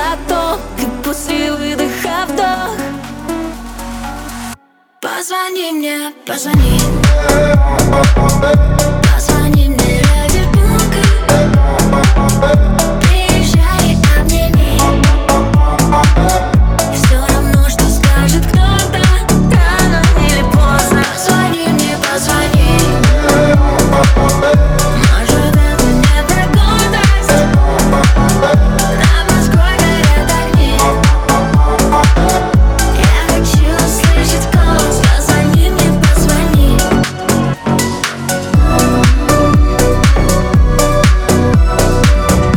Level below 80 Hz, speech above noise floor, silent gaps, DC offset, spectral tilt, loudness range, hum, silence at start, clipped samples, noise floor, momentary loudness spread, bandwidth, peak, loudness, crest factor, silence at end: -14 dBFS; 28 dB; none; under 0.1%; -5 dB/octave; 6 LU; none; 0 s; under 0.1%; -38 dBFS; 7 LU; 18.5 kHz; 0 dBFS; -11 LUFS; 10 dB; 0 s